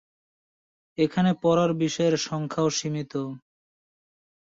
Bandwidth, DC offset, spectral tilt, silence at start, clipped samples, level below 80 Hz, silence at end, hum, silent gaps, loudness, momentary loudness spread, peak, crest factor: 7.8 kHz; under 0.1%; -5.5 dB/octave; 1 s; under 0.1%; -64 dBFS; 1.05 s; none; none; -25 LUFS; 12 LU; -10 dBFS; 16 dB